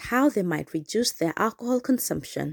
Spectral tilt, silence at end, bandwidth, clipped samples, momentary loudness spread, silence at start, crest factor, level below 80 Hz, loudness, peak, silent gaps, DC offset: -4.5 dB/octave; 0 s; over 20 kHz; under 0.1%; 6 LU; 0 s; 16 dB; -58 dBFS; -26 LUFS; -10 dBFS; none; under 0.1%